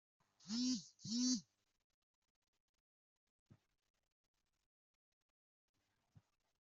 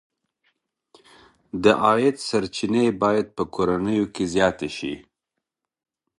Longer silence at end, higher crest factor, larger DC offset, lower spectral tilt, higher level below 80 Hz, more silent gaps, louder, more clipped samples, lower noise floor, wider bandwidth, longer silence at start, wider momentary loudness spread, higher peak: first, 5.2 s vs 1.2 s; about the same, 24 dB vs 22 dB; neither; second, -2.5 dB/octave vs -5.5 dB/octave; second, under -90 dBFS vs -54 dBFS; neither; second, -42 LUFS vs -22 LUFS; neither; second, -74 dBFS vs -83 dBFS; second, 8 kHz vs 11.5 kHz; second, 0.45 s vs 1.55 s; second, 7 LU vs 12 LU; second, -26 dBFS vs -2 dBFS